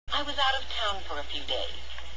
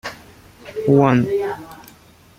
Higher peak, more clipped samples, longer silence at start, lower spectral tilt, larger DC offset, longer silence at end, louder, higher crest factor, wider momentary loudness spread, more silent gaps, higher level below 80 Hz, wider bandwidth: second, -14 dBFS vs -2 dBFS; neither; about the same, 0.05 s vs 0.05 s; second, -2.5 dB/octave vs -8 dB/octave; first, 3% vs under 0.1%; second, 0 s vs 0.6 s; second, -30 LUFS vs -17 LUFS; about the same, 18 dB vs 18 dB; second, 9 LU vs 19 LU; neither; first, -46 dBFS vs -54 dBFS; second, 8 kHz vs 16 kHz